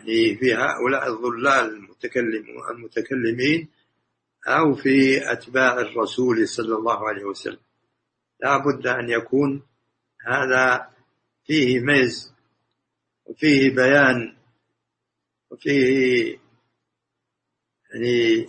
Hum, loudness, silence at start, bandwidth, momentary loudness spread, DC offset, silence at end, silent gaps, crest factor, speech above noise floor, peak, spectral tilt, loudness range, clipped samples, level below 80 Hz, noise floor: none; -20 LUFS; 0.05 s; 8.8 kHz; 13 LU; under 0.1%; 0 s; none; 20 dB; 61 dB; -2 dBFS; -5 dB/octave; 5 LU; under 0.1%; -64 dBFS; -81 dBFS